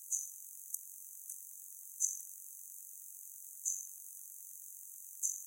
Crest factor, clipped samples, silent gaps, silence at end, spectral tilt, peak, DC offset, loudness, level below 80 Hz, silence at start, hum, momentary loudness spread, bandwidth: 32 dB; under 0.1%; none; 0 s; 6 dB/octave; -14 dBFS; under 0.1%; -42 LUFS; under -90 dBFS; 0 s; none; 12 LU; 16.5 kHz